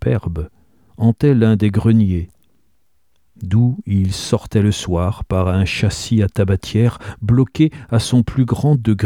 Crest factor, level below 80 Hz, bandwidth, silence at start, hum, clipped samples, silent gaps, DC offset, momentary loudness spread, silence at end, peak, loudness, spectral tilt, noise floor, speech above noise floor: 14 dB; -36 dBFS; 12.5 kHz; 0 s; none; under 0.1%; none; 0.2%; 7 LU; 0 s; -2 dBFS; -17 LUFS; -7 dB/octave; -67 dBFS; 52 dB